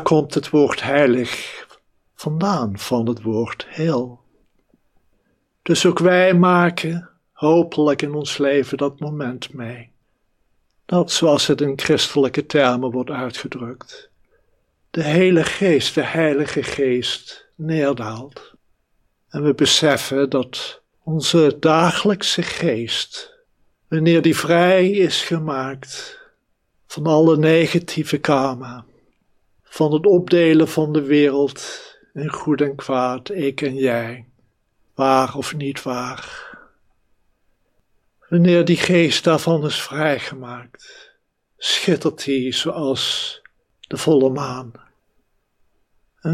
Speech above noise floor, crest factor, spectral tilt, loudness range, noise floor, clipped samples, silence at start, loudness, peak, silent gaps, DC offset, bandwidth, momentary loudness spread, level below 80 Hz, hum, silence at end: 48 dB; 18 dB; -5 dB/octave; 6 LU; -66 dBFS; under 0.1%; 0 s; -18 LUFS; 0 dBFS; none; under 0.1%; 15.5 kHz; 17 LU; -60 dBFS; none; 0 s